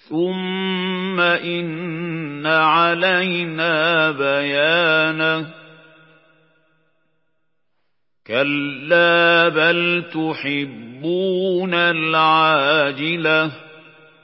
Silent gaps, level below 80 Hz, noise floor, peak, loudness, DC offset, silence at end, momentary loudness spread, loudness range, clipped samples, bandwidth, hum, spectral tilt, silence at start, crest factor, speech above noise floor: none; -76 dBFS; -76 dBFS; -2 dBFS; -17 LUFS; under 0.1%; 0.45 s; 11 LU; 7 LU; under 0.1%; 5.8 kHz; none; -10 dB/octave; 0.1 s; 18 dB; 58 dB